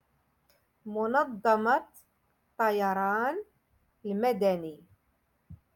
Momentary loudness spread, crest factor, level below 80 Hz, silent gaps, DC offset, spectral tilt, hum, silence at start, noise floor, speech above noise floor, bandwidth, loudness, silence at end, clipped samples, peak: 13 LU; 18 dB; -70 dBFS; none; under 0.1%; -6.5 dB/octave; none; 0.85 s; -73 dBFS; 45 dB; 17.5 kHz; -29 LUFS; 0.2 s; under 0.1%; -12 dBFS